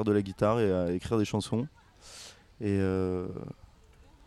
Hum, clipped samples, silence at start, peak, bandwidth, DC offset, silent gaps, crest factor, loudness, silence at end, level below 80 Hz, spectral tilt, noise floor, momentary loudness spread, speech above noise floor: none; under 0.1%; 0 s; -14 dBFS; 12.5 kHz; under 0.1%; none; 16 dB; -30 LUFS; 0.75 s; -56 dBFS; -7 dB/octave; -57 dBFS; 19 LU; 28 dB